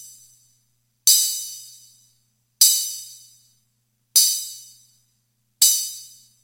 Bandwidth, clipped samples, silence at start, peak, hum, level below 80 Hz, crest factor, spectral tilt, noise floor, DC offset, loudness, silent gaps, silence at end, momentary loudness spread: 17 kHz; under 0.1%; 0 s; 0 dBFS; 60 Hz at -70 dBFS; -78 dBFS; 24 dB; 5.5 dB/octave; -70 dBFS; under 0.1%; -17 LUFS; none; 0.4 s; 23 LU